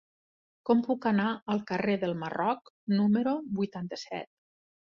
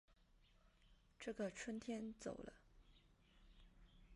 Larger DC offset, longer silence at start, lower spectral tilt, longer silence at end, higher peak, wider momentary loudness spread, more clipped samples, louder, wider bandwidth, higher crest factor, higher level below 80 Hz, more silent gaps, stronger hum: neither; first, 0.65 s vs 0.1 s; first, -7.5 dB/octave vs -4.5 dB/octave; first, 0.7 s vs 0 s; first, -12 dBFS vs -34 dBFS; first, 12 LU vs 8 LU; neither; first, -30 LUFS vs -50 LUFS; second, 7.2 kHz vs 11.5 kHz; about the same, 18 dB vs 20 dB; about the same, -70 dBFS vs -70 dBFS; first, 1.42-1.46 s, 2.70-2.87 s vs none; neither